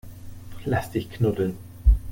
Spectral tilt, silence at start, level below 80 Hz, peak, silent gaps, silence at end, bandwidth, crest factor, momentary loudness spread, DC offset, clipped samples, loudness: -7.5 dB/octave; 0.05 s; -26 dBFS; -6 dBFS; none; 0 s; 17 kHz; 18 dB; 20 LU; under 0.1%; under 0.1%; -26 LUFS